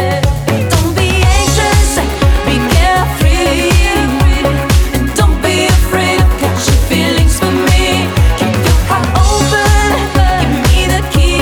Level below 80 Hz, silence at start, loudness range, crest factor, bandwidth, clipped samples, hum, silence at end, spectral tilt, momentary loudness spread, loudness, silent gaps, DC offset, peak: -14 dBFS; 0 s; 0 LU; 10 dB; over 20 kHz; under 0.1%; none; 0 s; -4.5 dB/octave; 2 LU; -11 LUFS; none; under 0.1%; 0 dBFS